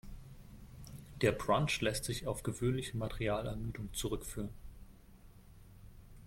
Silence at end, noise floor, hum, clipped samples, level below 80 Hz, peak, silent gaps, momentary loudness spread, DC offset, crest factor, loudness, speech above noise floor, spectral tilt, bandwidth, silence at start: 0 s; -58 dBFS; none; under 0.1%; -52 dBFS; -16 dBFS; none; 23 LU; under 0.1%; 22 dB; -37 LUFS; 22 dB; -5 dB/octave; 16.5 kHz; 0.05 s